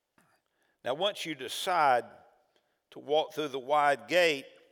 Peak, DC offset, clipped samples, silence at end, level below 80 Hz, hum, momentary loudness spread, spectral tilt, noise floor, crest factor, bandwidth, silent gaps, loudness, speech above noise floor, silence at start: -12 dBFS; under 0.1%; under 0.1%; 0.25 s; under -90 dBFS; none; 11 LU; -3 dB/octave; -74 dBFS; 20 dB; over 20 kHz; none; -29 LUFS; 45 dB; 0.85 s